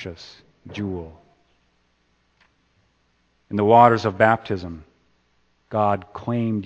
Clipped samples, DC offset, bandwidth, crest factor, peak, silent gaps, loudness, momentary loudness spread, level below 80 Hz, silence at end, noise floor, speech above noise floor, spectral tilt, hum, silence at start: under 0.1%; under 0.1%; 8.2 kHz; 24 dB; 0 dBFS; none; -20 LUFS; 26 LU; -56 dBFS; 0 s; -66 dBFS; 45 dB; -7.5 dB/octave; none; 0 s